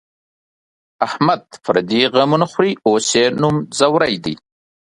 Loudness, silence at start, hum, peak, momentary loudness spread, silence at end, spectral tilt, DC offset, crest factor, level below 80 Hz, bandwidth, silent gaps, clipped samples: -16 LUFS; 1 s; none; 0 dBFS; 9 LU; 0.5 s; -4.5 dB/octave; under 0.1%; 16 dB; -56 dBFS; 11.5 kHz; none; under 0.1%